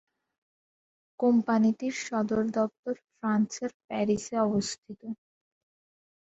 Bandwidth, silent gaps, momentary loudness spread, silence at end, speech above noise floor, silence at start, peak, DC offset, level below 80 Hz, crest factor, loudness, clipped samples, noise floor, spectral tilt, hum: 8.2 kHz; 2.79-2.83 s, 3.74-3.88 s, 4.78-4.83 s; 14 LU; 1.2 s; over 62 dB; 1.2 s; -14 dBFS; under 0.1%; -68 dBFS; 16 dB; -29 LUFS; under 0.1%; under -90 dBFS; -5.5 dB/octave; none